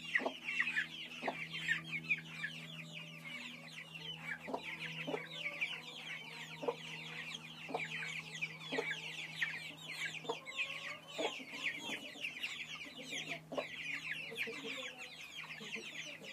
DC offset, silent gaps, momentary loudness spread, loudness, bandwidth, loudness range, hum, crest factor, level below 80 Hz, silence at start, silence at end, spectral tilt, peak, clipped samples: under 0.1%; none; 9 LU; -42 LUFS; 15.5 kHz; 3 LU; none; 24 dB; -82 dBFS; 0 s; 0 s; -2.5 dB/octave; -20 dBFS; under 0.1%